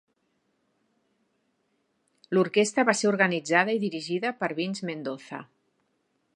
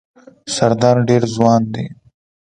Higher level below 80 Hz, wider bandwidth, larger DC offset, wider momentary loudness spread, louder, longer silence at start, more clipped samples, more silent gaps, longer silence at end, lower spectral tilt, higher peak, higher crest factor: second, -80 dBFS vs -50 dBFS; about the same, 11 kHz vs 10.5 kHz; neither; about the same, 13 LU vs 15 LU; second, -26 LUFS vs -15 LUFS; first, 2.3 s vs 0.45 s; neither; neither; first, 0.9 s vs 0.6 s; second, -4.5 dB/octave vs -6 dB/octave; second, -4 dBFS vs 0 dBFS; first, 24 dB vs 16 dB